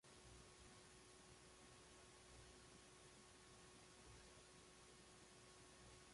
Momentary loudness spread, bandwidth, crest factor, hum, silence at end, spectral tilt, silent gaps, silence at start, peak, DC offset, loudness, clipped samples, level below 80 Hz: 1 LU; 11.5 kHz; 14 dB; none; 0 s; -3 dB/octave; none; 0.05 s; -52 dBFS; under 0.1%; -65 LUFS; under 0.1%; -76 dBFS